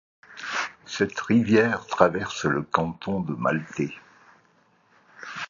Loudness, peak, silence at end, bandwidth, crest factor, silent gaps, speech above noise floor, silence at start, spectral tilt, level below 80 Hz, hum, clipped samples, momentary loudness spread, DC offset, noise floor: -25 LUFS; -2 dBFS; 0.05 s; 7.4 kHz; 26 dB; none; 39 dB; 0.3 s; -5.5 dB/octave; -56 dBFS; none; under 0.1%; 17 LU; under 0.1%; -62 dBFS